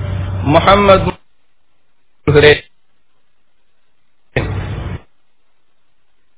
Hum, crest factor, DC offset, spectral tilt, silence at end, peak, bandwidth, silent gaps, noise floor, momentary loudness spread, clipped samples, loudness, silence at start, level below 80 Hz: none; 16 dB; 0.6%; -10 dB/octave; 1.4 s; 0 dBFS; 4 kHz; none; -66 dBFS; 16 LU; 0.5%; -12 LUFS; 0 s; -32 dBFS